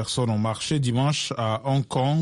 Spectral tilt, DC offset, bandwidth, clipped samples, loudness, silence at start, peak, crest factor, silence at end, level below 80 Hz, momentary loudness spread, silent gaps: -5.5 dB/octave; under 0.1%; 11.5 kHz; under 0.1%; -24 LUFS; 0 s; -12 dBFS; 12 dB; 0 s; -56 dBFS; 3 LU; none